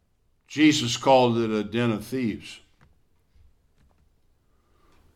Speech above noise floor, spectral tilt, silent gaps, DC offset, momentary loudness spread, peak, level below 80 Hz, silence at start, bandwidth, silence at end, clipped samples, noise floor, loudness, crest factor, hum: 43 dB; -5 dB/octave; none; under 0.1%; 15 LU; -6 dBFS; -60 dBFS; 0.5 s; 14.5 kHz; 2.6 s; under 0.1%; -65 dBFS; -23 LUFS; 20 dB; none